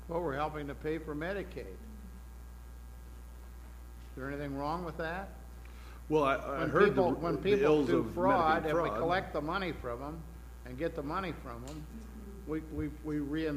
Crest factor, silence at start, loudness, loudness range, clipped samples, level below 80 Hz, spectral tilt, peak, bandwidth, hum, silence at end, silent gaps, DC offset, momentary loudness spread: 20 dB; 0 s; -33 LUFS; 14 LU; under 0.1%; -48 dBFS; -7 dB/octave; -14 dBFS; 15.5 kHz; 60 Hz at -50 dBFS; 0 s; none; under 0.1%; 23 LU